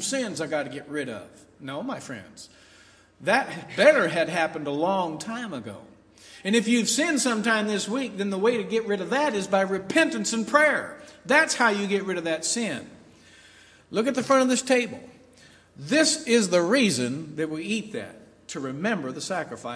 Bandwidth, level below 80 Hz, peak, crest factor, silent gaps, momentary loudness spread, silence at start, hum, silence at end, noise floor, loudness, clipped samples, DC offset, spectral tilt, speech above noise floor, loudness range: 11 kHz; -70 dBFS; -4 dBFS; 22 dB; none; 16 LU; 0 s; none; 0 s; -55 dBFS; -24 LUFS; under 0.1%; under 0.1%; -3.5 dB/octave; 30 dB; 4 LU